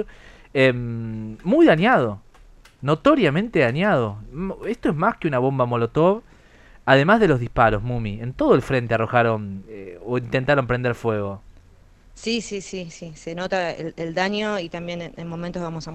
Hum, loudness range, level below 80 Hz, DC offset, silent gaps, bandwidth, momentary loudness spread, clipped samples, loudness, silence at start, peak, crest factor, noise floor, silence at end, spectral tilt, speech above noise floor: none; 8 LU; -44 dBFS; under 0.1%; none; 11.5 kHz; 15 LU; under 0.1%; -21 LUFS; 0 s; -2 dBFS; 20 dB; -50 dBFS; 0 s; -6.5 dB/octave; 29 dB